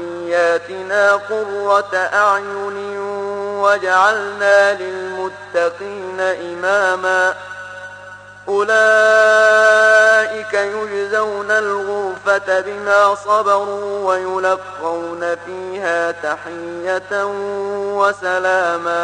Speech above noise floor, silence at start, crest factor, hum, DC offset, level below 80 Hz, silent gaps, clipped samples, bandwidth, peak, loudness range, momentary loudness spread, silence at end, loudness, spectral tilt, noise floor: 21 dB; 0 s; 14 dB; 50 Hz at -50 dBFS; under 0.1%; -64 dBFS; none; under 0.1%; 9.8 kHz; -2 dBFS; 8 LU; 14 LU; 0 s; -16 LUFS; -3 dB/octave; -37 dBFS